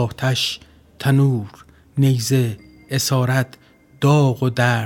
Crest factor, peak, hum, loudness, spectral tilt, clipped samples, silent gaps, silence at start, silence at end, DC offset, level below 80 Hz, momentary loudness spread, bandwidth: 18 dB; -2 dBFS; none; -19 LUFS; -5.5 dB/octave; under 0.1%; none; 0 s; 0 s; under 0.1%; -54 dBFS; 13 LU; 18 kHz